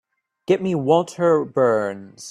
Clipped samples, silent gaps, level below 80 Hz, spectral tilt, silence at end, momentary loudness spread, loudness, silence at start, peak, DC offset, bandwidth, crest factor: under 0.1%; none; -64 dBFS; -6.5 dB/octave; 0 s; 12 LU; -20 LUFS; 0.5 s; -4 dBFS; under 0.1%; 12 kHz; 16 dB